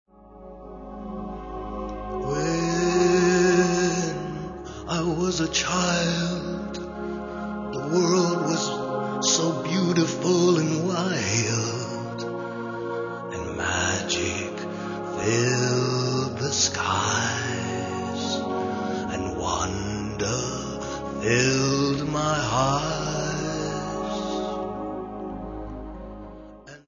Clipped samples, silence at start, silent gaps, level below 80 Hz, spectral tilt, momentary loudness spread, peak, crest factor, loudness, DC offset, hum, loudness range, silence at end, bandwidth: under 0.1%; 0.2 s; none; -46 dBFS; -4 dB/octave; 14 LU; -8 dBFS; 18 dB; -25 LUFS; under 0.1%; none; 5 LU; 0.1 s; 7.4 kHz